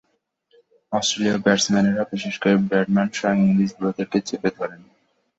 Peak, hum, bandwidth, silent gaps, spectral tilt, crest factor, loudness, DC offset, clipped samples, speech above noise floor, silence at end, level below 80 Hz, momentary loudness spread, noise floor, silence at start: -2 dBFS; none; 8 kHz; none; -5 dB/octave; 20 dB; -21 LUFS; under 0.1%; under 0.1%; 49 dB; 0.6 s; -60 dBFS; 8 LU; -69 dBFS; 0.9 s